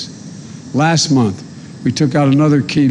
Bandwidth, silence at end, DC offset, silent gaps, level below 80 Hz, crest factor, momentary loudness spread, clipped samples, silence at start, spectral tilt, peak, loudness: 10.5 kHz; 0 s; under 0.1%; none; -50 dBFS; 10 dB; 20 LU; under 0.1%; 0 s; -5.5 dB/octave; -4 dBFS; -14 LUFS